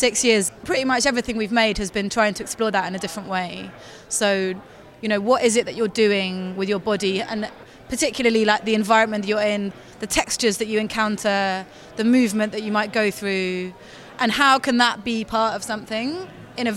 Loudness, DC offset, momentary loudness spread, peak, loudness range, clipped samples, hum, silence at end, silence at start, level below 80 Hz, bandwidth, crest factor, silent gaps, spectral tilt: -21 LUFS; under 0.1%; 12 LU; -2 dBFS; 2 LU; under 0.1%; none; 0 s; 0 s; -50 dBFS; 16 kHz; 20 dB; none; -3.5 dB/octave